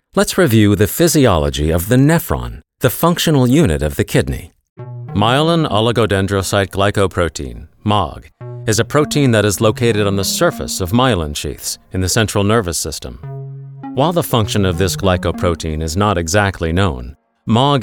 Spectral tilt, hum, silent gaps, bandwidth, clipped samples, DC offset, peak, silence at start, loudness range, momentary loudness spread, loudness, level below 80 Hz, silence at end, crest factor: -5 dB/octave; none; 4.69-4.76 s; 19.5 kHz; under 0.1%; 0.2%; 0 dBFS; 0.15 s; 4 LU; 14 LU; -15 LUFS; -34 dBFS; 0 s; 14 dB